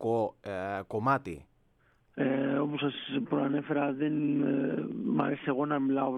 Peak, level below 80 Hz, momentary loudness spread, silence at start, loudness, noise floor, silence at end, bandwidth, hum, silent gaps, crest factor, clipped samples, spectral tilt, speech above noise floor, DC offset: -14 dBFS; -68 dBFS; 7 LU; 0 s; -31 LUFS; -68 dBFS; 0 s; 6 kHz; none; none; 18 dB; under 0.1%; -8 dB/octave; 38 dB; under 0.1%